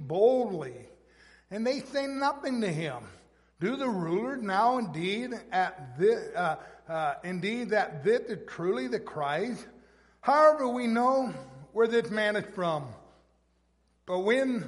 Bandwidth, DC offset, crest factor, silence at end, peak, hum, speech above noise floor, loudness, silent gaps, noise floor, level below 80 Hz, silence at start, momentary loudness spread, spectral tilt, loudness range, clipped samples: 11.5 kHz; under 0.1%; 20 dB; 0 s; -8 dBFS; none; 41 dB; -29 LUFS; none; -70 dBFS; -68 dBFS; 0 s; 12 LU; -6 dB/octave; 5 LU; under 0.1%